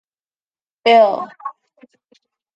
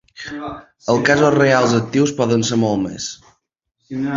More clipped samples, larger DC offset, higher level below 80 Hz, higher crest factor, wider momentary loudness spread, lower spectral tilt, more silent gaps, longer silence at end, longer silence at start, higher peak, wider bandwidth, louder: neither; neither; second, -74 dBFS vs -52 dBFS; about the same, 18 dB vs 16 dB; first, 21 LU vs 16 LU; about the same, -4.5 dB/octave vs -5 dB/octave; neither; first, 1.05 s vs 0 s; first, 0.85 s vs 0.2 s; about the same, -2 dBFS vs -2 dBFS; about the same, 7.6 kHz vs 7.8 kHz; about the same, -14 LUFS vs -16 LUFS